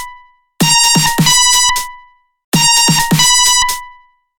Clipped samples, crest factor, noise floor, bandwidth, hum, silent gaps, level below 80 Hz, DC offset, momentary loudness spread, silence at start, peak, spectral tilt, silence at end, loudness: under 0.1%; 12 dB; -42 dBFS; 19 kHz; none; 2.44-2.52 s; -36 dBFS; under 0.1%; 10 LU; 0 s; 0 dBFS; -1.5 dB/octave; 0.5 s; -9 LUFS